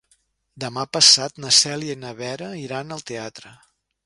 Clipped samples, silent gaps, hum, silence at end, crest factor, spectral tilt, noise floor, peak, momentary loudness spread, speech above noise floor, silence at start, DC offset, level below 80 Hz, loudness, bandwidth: under 0.1%; none; none; 0.55 s; 24 dB; -1 dB/octave; -65 dBFS; 0 dBFS; 20 LU; 43 dB; 0.55 s; under 0.1%; -66 dBFS; -16 LUFS; 11.5 kHz